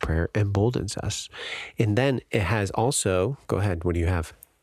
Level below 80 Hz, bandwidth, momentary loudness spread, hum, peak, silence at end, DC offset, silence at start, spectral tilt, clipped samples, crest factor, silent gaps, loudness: -40 dBFS; 14 kHz; 8 LU; none; -6 dBFS; 0.3 s; under 0.1%; 0 s; -5.5 dB/octave; under 0.1%; 18 dB; none; -26 LUFS